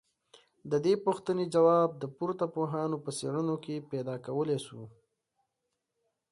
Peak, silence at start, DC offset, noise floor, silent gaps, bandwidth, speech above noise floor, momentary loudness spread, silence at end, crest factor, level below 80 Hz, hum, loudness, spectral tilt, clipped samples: -12 dBFS; 0.65 s; under 0.1%; -84 dBFS; none; 11.5 kHz; 54 dB; 12 LU; 1.45 s; 20 dB; -76 dBFS; none; -31 LUFS; -6.5 dB/octave; under 0.1%